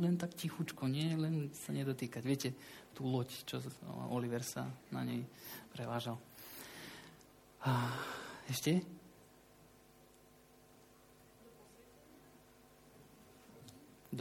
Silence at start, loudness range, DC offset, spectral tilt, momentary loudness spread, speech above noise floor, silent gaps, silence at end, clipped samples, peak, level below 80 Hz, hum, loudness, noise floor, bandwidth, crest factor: 0 s; 23 LU; under 0.1%; -5.5 dB/octave; 25 LU; 25 dB; none; 0 s; under 0.1%; -22 dBFS; -76 dBFS; none; -41 LUFS; -64 dBFS; 17 kHz; 20 dB